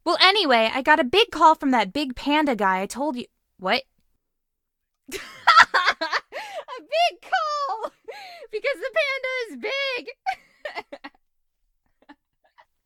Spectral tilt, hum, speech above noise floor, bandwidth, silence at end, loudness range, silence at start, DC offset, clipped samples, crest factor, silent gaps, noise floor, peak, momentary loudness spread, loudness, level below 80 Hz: -2.5 dB/octave; none; 57 dB; 17 kHz; 0.75 s; 8 LU; 0.05 s; under 0.1%; under 0.1%; 24 dB; none; -79 dBFS; 0 dBFS; 19 LU; -21 LUFS; -58 dBFS